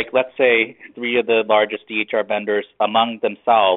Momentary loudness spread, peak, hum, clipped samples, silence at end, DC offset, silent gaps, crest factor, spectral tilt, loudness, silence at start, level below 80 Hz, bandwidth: 7 LU; -2 dBFS; none; under 0.1%; 0 s; under 0.1%; none; 16 dB; -0.5 dB/octave; -19 LUFS; 0 s; -66 dBFS; 4.1 kHz